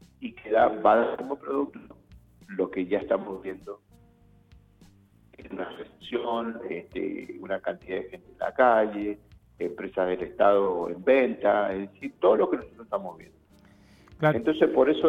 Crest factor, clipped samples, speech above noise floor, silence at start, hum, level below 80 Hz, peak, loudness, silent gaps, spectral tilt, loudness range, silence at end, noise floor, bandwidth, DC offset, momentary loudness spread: 20 dB; under 0.1%; 32 dB; 0.2 s; none; -60 dBFS; -6 dBFS; -26 LUFS; none; -8 dB/octave; 11 LU; 0 s; -58 dBFS; 6.8 kHz; under 0.1%; 17 LU